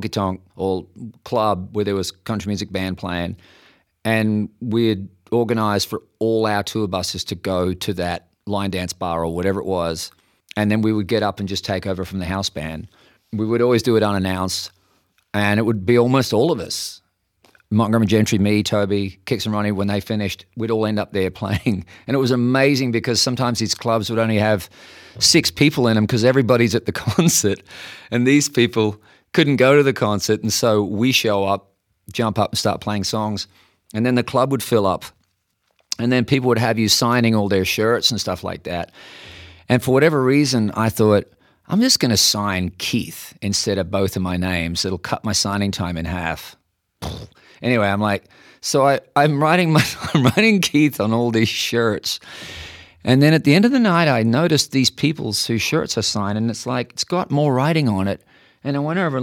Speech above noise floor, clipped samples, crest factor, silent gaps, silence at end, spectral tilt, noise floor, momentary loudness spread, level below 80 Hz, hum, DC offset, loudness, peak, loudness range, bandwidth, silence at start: 50 dB; under 0.1%; 18 dB; none; 0 s; -4.5 dB/octave; -69 dBFS; 12 LU; -50 dBFS; none; under 0.1%; -19 LUFS; -2 dBFS; 6 LU; 18 kHz; 0 s